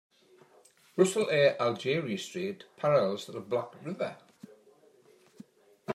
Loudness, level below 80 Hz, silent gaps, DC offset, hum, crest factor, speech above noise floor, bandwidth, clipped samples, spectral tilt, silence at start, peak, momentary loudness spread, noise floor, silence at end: -30 LUFS; -80 dBFS; none; under 0.1%; none; 20 dB; 32 dB; 13.5 kHz; under 0.1%; -5 dB/octave; 0.95 s; -10 dBFS; 14 LU; -62 dBFS; 0 s